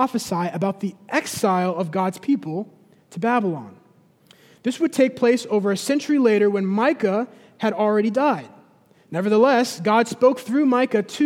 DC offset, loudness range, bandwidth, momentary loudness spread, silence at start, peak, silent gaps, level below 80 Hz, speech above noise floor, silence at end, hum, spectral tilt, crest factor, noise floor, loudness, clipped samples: under 0.1%; 4 LU; 16.5 kHz; 11 LU; 0 s; -4 dBFS; none; -72 dBFS; 35 dB; 0 s; none; -5.5 dB/octave; 18 dB; -55 dBFS; -21 LUFS; under 0.1%